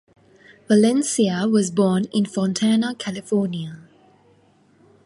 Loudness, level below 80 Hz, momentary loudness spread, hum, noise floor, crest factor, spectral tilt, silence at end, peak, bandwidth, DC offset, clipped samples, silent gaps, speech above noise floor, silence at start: -20 LUFS; -64 dBFS; 10 LU; none; -57 dBFS; 18 dB; -5.5 dB/octave; 1.25 s; -4 dBFS; 11.5 kHz; under 0.1%; under 0.1%; none; 37 dB; 0.7 s